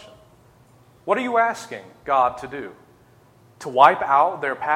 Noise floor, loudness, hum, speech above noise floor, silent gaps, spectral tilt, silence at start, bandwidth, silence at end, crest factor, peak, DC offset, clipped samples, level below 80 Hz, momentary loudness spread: -53 dBFS; -19 LUFS; none; 33 dB; none; -4.5 dB/octave; 1.05 s; 14.5 kHz; 0 s; 22 dB; 0 dBFS; under 0.1%; under 0.1%; -62 dBFS; 21 LU